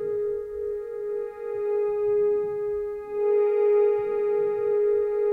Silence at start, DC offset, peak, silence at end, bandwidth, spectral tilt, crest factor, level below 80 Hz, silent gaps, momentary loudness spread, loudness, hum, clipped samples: 0 s; under 0.1%; -14 dBFS; 0 s; 2.9 kHz; -8 dB/octave; 12 dB; -58 dBFS; none; 10 LU; -25 LUFS; none; under 0.1%